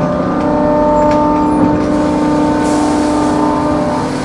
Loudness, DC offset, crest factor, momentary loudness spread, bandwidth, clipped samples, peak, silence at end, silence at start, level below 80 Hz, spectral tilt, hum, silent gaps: -12 LUFS; under 0.1%; 10 dB; 3 LU; 11.5 kHz; under 0.1%; -2 dBFS; 0 s; 0 s; -32 dBFS; -6.5 dB/octave; none; none